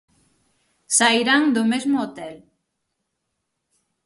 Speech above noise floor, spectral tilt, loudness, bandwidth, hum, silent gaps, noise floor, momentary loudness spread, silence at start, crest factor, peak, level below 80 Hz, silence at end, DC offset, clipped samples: 58 dB; -2 dB/octave; -19 LUFS; 11.5 kHz; none; none; -77 dBFS; 18 LU; 0.9 s; 20 dB; -4 dBFS; -70 dBFS; 1.7 s; under 0.1%; under 0.1%